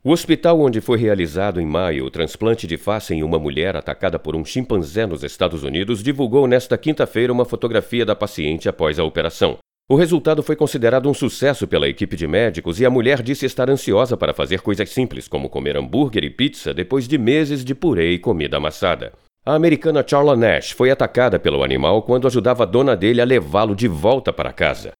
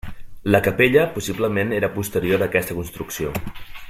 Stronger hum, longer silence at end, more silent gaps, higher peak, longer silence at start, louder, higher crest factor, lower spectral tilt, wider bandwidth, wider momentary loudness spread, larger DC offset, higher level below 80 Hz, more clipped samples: neither; about the same, 0.1 s vs 0 s; neither; about the same, 0 dBFS vs -2 dBFS; about the same, 0.05 s vs 0.05 s; first, -18 LUFS vs -21 LUFS; about the same, 18 dB vs 20 dB; about the same, -6 dB/octave vs -5.5 dB/octave; first, 18.5 kHz vs 16.5 kHz; second, 7 LU vs 14 LU; neither; about the same, -42 dBFS vs -42 dBFS; neither